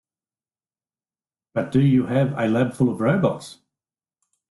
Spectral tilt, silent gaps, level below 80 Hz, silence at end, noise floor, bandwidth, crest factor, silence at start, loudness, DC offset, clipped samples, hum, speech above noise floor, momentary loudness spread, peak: -8 dB/octave; none; -56 dBFS; 0.95 s; under -90 dBFS; 12 kHz; 16 dB; 1.55 s; -21 LUFS; under 0.1%; under 0.1%; none; over 70 dB; 11 LU; -6 dBFS